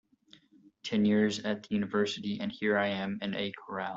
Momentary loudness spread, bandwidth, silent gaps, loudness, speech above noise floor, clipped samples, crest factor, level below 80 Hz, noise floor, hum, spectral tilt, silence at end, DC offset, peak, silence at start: 9 LU; 7.8 kHz; none; -31 LUFS; 31 dB; under 0.1%; 16 dB; -70 dBFS; -62 dBFS; none; -5.5 dB/octave; 0 s; under 0.1%; -16 dBFS; 0.85 s